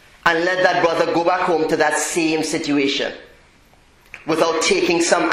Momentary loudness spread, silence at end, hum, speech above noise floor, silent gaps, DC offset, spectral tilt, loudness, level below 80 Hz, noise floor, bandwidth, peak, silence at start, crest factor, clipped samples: 6 LU; 0 s; none; 34 dB; none; under 0.1%; -3 dB/octave; -18 LUFS; -54 dBFS; -52 dBFS; 15 kHz; 0 dBFS; 0.25 s; 18 dB; under 0.1%